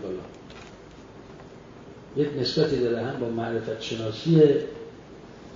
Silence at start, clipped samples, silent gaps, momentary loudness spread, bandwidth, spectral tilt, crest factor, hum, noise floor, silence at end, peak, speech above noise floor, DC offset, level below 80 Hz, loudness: 0 s; under 0.1%; none; 26 LU; 7.6 kHz; -7 dB/octave; 20 dB; none; -46 dBFS; 0 s; -6 dBFS; 22 dB; under 0.1%; -56 dBFS; -25 LUFS